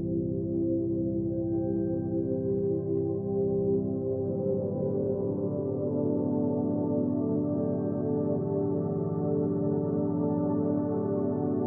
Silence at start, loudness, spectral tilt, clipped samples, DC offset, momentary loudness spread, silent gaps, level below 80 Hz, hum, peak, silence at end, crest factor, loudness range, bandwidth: 0 s; -29 LUFS; -15.5 dB/octave; under 0.1%; under 0.1%; 2 LU; none; -56 dBFS; none; -16 dBFS; 0 s; 12 dB; 1 LU; 1.9 kHz